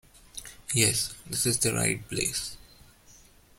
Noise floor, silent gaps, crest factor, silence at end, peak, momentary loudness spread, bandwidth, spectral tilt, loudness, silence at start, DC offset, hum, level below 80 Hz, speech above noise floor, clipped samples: -56 dBFS; none; 24 dB; 0.45 s; -6 dBFS; 18 LU; 16.5 kHz; -2.5 dB/octave; -26 LUFS; 0.35 s; under 0.1%; none; -54 dBFS; 28 dB; under 0.1%